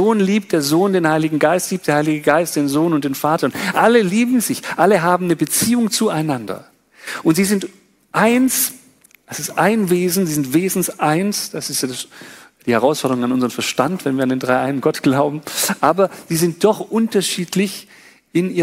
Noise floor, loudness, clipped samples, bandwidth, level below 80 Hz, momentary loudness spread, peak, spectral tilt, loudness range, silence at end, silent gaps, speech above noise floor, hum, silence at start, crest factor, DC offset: -50 dBFS; -17 LUFS; under 0.1%; 16.5 kHz; -60 dBFS; 7 LU; 0 dBFS; -4.5 dB/octave; 3 LU; 0 s; none; 33 dB; none; 0 s; 16 dB; under 0.1%